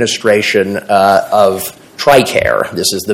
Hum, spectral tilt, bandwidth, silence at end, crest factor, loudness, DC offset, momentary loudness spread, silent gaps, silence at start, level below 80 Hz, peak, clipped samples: none; -3.5 dB/octave; 17.5 kHz; 0 s; 12 dB; -11 LUFS; under 0.1%; 6 LU; none; 0 s; -42 dBFS; 0 dBFS; 0.9%